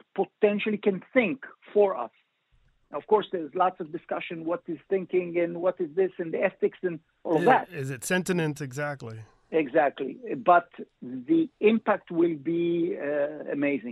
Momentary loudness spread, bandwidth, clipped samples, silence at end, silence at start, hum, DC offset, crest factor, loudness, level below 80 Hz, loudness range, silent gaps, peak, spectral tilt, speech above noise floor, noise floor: 13 LU; 14 kHz; under 0.1%; 0 s; 0.15 s; none; under 0.1%; 20 dB; -27 LUFS; -72 dBFS; 3 LU; none; -8 dBFS; -6 dB/octave; 39 dB; -66 dBFS